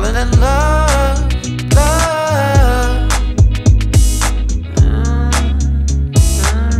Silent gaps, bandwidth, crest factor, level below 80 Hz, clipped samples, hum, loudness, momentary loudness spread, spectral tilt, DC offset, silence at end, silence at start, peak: none; 15 kHz; 12 dB; -14 dBFS; under 0.1%; none; -14 LUFS; 4 LU; -5 dB/octave; under 0.1%; 0 s; 0 s; 0 dBFS